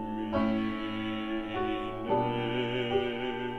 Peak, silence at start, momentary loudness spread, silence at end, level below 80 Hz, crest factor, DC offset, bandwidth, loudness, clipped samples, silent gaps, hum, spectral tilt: -16 dBFS; 0 s; 5 LU; 0 s; -50 dBFS; 16 dB; under 0.1%; 7.8 kHz; -31 LUFS; under 0.1%; none; none; -7.5 dB/octave